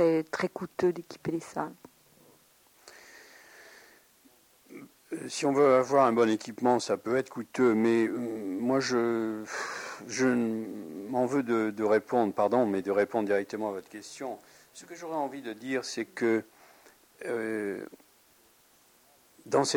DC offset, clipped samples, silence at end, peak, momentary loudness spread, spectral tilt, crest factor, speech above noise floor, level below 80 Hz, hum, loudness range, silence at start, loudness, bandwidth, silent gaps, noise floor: under 0.1%; under 0.1%; 0 s; -10 dBFS; 16 LU; -5 dB/octave; 20 dB; 34 dB; -74 dBFS; none; 10 LU; 0 s; -29 LUFS; 17 kHz; none; -63 dBFS